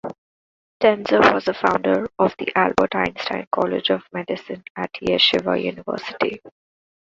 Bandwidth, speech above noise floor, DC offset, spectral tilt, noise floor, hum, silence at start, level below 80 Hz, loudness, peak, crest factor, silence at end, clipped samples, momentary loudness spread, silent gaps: 7.8 kHz; over 70 dB; under 0.1%; -5.5 dB/octave; under -90 dBFS; none; 0.05 s; -54 dBFS; -20 LUFS; 0 dBFS; 20 dB; 0.55 s; under 0.1%; 13 LU; 0.18-0.80 s, 3.47-3.51 s, 4.70-4.75 s